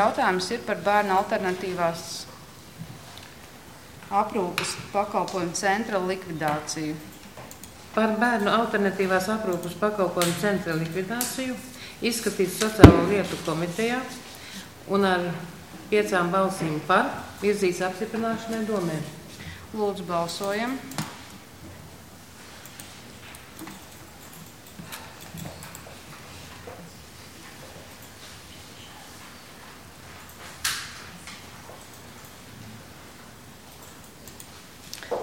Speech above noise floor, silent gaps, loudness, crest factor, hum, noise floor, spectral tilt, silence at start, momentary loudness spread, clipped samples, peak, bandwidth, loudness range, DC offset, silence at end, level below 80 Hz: 22 dB; none; -25 LUFS; 28 dB; none; -46 dBFS; -5 dB/octave; 0 s; 21 LU; under 0.1%; 0 dBFS; 17 kHz; 21 LU; 0.2%; 0 s; -44 dBFS